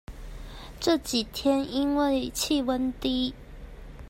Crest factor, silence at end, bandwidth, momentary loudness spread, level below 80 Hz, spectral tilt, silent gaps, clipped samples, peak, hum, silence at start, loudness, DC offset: 16 dB; 0 s; 16 kHz; 20 LU; -44 dBFS; -3.5 dB/octave; none; under 0.1%; -12 dBFS; none; 0.1 s; -27 LUFS; under 0.1%